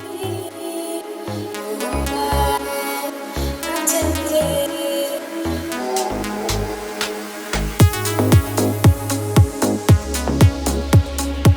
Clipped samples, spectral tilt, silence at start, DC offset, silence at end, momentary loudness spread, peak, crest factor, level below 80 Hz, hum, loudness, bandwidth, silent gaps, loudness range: under 0.1%; -5 dB/octave; 0 s; under 0.1%; 0 s; 11 LU; 0 dBFS; 18 dB; -30 dBFS; none; -20 LUFS; over 20 kHz; none; 6 LU